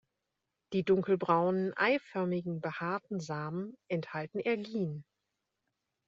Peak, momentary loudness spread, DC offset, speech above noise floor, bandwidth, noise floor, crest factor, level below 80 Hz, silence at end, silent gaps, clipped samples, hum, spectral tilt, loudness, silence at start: -14 dBFS; 10 LU; under 0.1%; 54 dB; 7.6 kHz; -86 dBFS; 20 dB; -76 dBFS; 1.05 s; none; under 0.1%; none; -5.5 dB/octave; -33 LUFS; 0.7 s